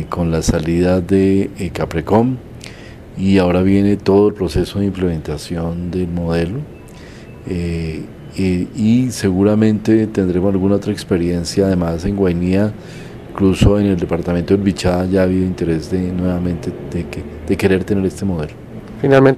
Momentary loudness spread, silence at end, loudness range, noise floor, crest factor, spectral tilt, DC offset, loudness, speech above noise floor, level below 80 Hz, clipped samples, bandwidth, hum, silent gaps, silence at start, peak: 15 LU; 0 s; 5 LU; -35 dBFS; 16 dB; -7 dB/octave; under 0.1%; -16 LUFS; 20 dB; -34 dBFS; under 0.1%; 14 kHz; none; none; 0 s; 0 dBFS